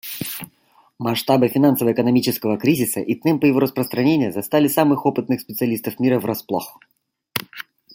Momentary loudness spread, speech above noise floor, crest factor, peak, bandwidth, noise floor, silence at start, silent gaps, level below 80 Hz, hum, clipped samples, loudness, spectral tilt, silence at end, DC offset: 11 LU; 39 dB; 18 dB; -2 dBFS; 17 kHz; -57 dBFS; 0.05 s; none; -62 dBFS; none; under 0.1%; -19 LUFS; -5.5 dB/octave; 0.35 s; under 0.1%